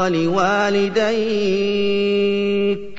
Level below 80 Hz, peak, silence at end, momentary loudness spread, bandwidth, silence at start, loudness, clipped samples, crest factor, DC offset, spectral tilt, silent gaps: -52 dBFS; -4 dBFS; 0 s; 2 LU; 7.8 kHz; 0 s; -18 LUFS; under 0.1%; 12 dB; 2%; -5.5 dB/octave; none